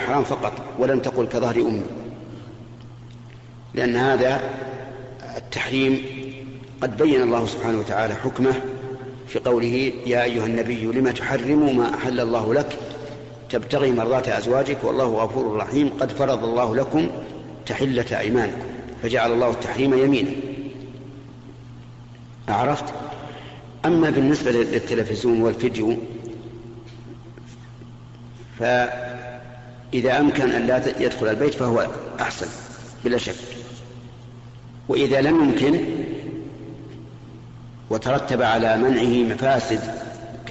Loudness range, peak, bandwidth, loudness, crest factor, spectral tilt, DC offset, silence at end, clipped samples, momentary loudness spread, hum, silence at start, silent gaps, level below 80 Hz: 5 LU; -10 dBFS; 8 kHz; -22 LUFS; 14 dB; -5 dB/octave; under 0.1%; 0 s; under 0.1%; 23 LU; none; 0 s; none; -50 dBFS